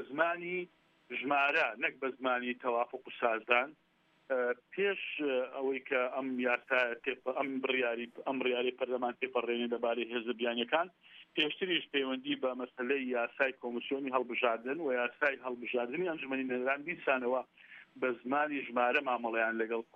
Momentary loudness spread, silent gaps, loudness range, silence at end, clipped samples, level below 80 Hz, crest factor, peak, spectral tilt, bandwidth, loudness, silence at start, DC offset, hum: 7 LU; none; 1 LU; 0.1 s; under 0.1%; -88 dBFS; 22 dB; -12 dBFS; -5.5 dB/octave; 6.8 kHz; -34 LUFS; 0 s; under 0.1%; none